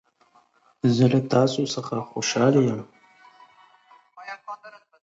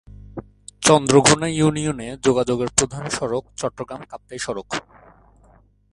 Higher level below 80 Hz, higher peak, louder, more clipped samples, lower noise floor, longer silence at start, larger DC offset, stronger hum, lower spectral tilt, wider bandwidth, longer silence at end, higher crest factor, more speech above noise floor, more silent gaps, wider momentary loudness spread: second, -66 dBFS vs -48 dBFS; second, -6 dBFS vs 0 dBFS; about the same, -22 LUFS vs -20 LUFS; neither; first, -61 dBFS vs -54 dBFS; first, 0.85 s vs 0.35 s; neither; neither; first, -6 dB/octave vs -4 dB/octave; second, 8 kHz vs 11.5 kHz; second, 0.35 s vs 1.15 s; about the same, 20 dB vs 22 dB; first, 40 dB vs 34 dB; neither; about the same, 20 LU vs 22 LU